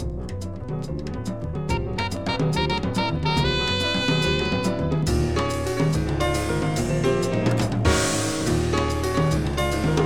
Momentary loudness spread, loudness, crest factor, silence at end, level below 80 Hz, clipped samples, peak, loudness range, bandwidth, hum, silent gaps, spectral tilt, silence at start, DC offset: 9 LU; -23 LUFS; 16 dB; 0 s; -34 dBFS; under 0.1%; -6 dBFS; 2 LU; 18 kHz; none; none; -5 dB/octave; 0 s; under 0.1%